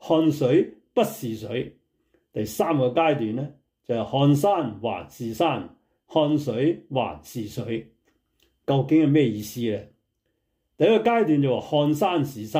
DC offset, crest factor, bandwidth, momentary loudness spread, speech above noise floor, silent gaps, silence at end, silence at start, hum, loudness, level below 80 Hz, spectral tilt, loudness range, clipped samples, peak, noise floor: under 0.1%; 16 dB; 16 kHz; 13 LU; 52 dB; none; 0 s; 0 s; none; -24 LUFS; -62 dBFS; -7 dB/octave; 4 LU; under 0.1%; -8 dBFS; -75 dBFS